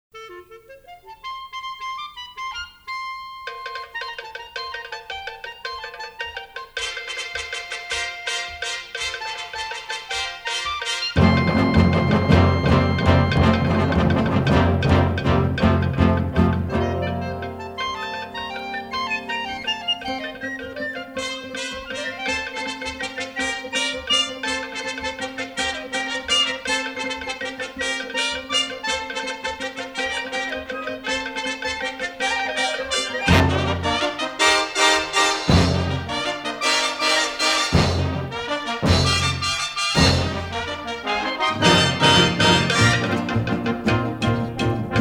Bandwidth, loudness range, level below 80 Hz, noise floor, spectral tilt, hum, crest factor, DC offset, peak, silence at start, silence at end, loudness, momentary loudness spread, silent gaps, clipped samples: 16 kHz; 13 LU; -38 dBFS; -44 dBFS; -4.5 dB/octave; none; 20 dB; under 0.1%; -2 dBFS; 0.15 s; 0 s; -21 LUFS; 14 LU; none; under 0.1%